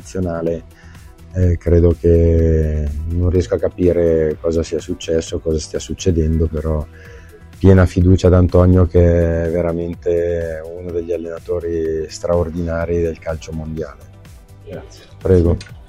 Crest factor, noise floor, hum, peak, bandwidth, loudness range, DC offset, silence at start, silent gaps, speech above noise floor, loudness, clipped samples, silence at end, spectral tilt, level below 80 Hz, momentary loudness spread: 16 dB; -39 dBFS; none; 0 dBFS; 9 kHz; 7 LU; under 0.1%; 0.05 s; none; 24 dB; -17 LUFS; under 0.1%; 0.1 s; -8 dB/octave; -26 dBFS; 14 LU